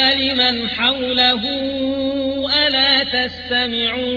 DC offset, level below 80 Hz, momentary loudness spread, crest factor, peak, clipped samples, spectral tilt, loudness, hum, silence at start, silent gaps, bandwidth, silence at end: under 0.1%; -46 dBFS; 7 LU; 16 dB; -2 dBFS; under 0.1%; -4.5 dB/octave; -16 LUFS; none; 0 s; none; 5.4 kHz; 0 s